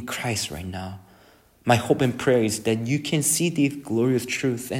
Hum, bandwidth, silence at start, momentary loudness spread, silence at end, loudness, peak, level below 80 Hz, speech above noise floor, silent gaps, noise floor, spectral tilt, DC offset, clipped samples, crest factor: none; 16.5 kHz; 0 s; 11 LU; 0 s; -23 LUFS; -4 dBFS; -56 dBFS; 32 dB; none; -55 dBFS; -4.5 dB/octave; under 0.1%; under 0.1%; 20 dB